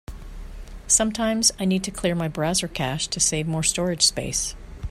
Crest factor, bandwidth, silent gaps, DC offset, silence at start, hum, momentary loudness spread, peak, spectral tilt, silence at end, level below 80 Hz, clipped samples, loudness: 20 dB; 15.5 kHz; none; under 0.1%; 0.1 s; none; 22 LU; -4 dBFS; -3 dB/octave; 0 s; -40 dBFS; under 0.1%; -22 LUFS